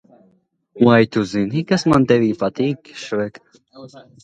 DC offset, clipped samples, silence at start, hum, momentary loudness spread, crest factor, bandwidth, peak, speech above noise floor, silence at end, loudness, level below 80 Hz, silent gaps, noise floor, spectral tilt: under 0.1%; under 0.1%; 0.75 s; none; 11 LU; 18 dB; 9.2 kHz; 0 dBFS; 42 dB; 0.25 s; -18 LUFS; -52 dBFS; none; -60 dBFS; -6.5 dB/octave